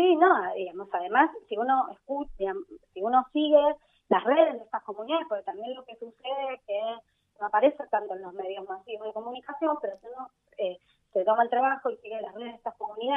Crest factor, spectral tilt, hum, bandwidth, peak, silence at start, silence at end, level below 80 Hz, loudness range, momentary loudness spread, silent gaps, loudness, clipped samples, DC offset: 20 dB; -7 dB/octave; none; 3.9 kHz; -8 dBFS; 0 s; 0 s; -62 dBFS; 5 LU; 16 LU; none; -28 LUFS; under 0.1%; under 0.1%